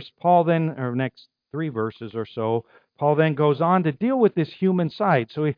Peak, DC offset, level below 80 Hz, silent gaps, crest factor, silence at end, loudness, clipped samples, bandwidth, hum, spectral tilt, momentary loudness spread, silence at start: -6 dBFS; under 0.1%; -70 dBFS; none; 16 dB; 0.05 s; -22 LUFS; under 0.1%; 5.2 kHz; none; -10.5 dB/octave; 10 LU; 0 s